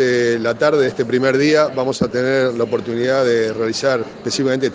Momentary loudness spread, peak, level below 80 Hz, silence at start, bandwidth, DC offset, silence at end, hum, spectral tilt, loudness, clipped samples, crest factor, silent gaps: 5 LU; 0 dBFS; -56 dBFS; 0 s; 9.8 kHz; under 0.1%; 0 s; none; -5 dB/octave; -17 LUFS; under 0.1%; 16 dB; none